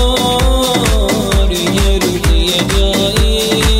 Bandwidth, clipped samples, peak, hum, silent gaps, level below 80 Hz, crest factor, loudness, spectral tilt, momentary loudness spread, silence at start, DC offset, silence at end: 16.5 kHz; under 0.1%; 0 dBFS; none; none; -16 dBFS; 12 dB; -12 LUFS; -4 dB/octave; 1 LU; 0 s; under 0.1%; 0 s